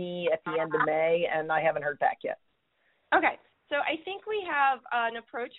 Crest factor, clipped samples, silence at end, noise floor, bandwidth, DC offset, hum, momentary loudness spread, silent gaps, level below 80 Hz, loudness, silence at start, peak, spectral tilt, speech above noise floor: 20 dB; under 0.1%; 0 s; -72 dBFS; 4.1 kHz; under 0.1%; none; 9 LU; none; -72 dBFS; -28 LUFS; 0 s; -10 dBFS; -2 dB/octave; 44 dB